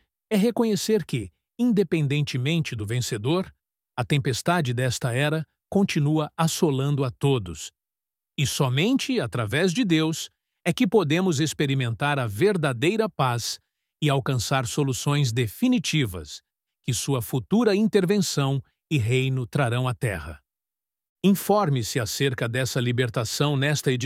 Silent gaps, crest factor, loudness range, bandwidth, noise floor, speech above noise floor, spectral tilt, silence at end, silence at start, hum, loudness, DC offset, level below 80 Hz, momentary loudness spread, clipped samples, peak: 21.09-21.16 s; 18 dB; 2 LU; 16.5 kHz; under -90 dBFS; over 67 dB; -5.5 dB/octave; 0 s; 0.3 s; none; -24 LUFS; under 0.1%; -56 dBFS; 8 LU; under 0.1%; -6 dBFS